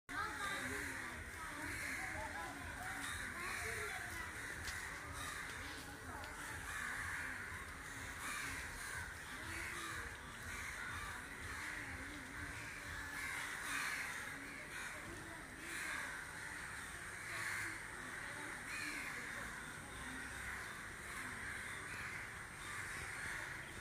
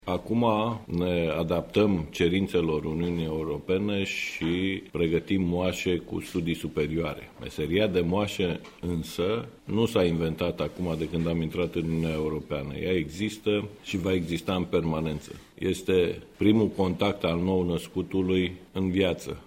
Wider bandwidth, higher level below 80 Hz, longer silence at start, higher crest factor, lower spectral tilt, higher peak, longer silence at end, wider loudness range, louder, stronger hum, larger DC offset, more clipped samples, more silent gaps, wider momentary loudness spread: about the same, 15.5 kHz vs 16 kHz; second, -62 dBFS vs -52 dBFS; about the same, 0.1 s vs 0.05 s; about the same, 18 dB vs 20 dB; second, -2.5 dB/octave vs -6.5 dB/octave; second, -30 dBFS vs -8 dBFS; about the same, 0 s vs 0 s; about the same, 2 LU vs 3 LU; second, -45 LUFS vs -28 LUFS; neither; neither; neither; neither; about the same, 6 LU vs 7 LU